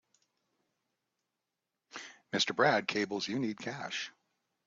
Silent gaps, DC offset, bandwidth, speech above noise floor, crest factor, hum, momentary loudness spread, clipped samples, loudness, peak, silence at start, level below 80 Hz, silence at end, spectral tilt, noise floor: none; under 0.1%; 7.8 kHz; 55 dB; 22 dB; none; 19 LU; under 0.1%; -33 LUFS; -14 dBFS; 1.95 s; -80 dBFS; 0.55 s; -3.5 dB/octave; -88 dBFS